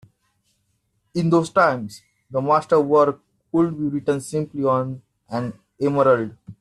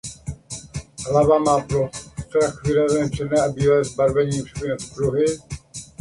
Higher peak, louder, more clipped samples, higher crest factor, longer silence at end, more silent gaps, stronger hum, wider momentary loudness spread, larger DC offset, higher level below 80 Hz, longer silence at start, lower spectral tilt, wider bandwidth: about the same, -4 dBFS vs -4 dBFS; about the same, -21 LUFS vs -21 LUFS; neither; about the same, 18 dB vs 16 dB; about the same, 0.1 s vs 0.15 s; neither; neither; about the same, 14 LU vs 16 LU; neither; second, -62 dBFS vs -42 dBFS; first, 1.15 s vs 0.05 s; about the same, -7 dB/octave vs -6 dB/octave; about the same, 12.5 kHz vs 11.5 kHz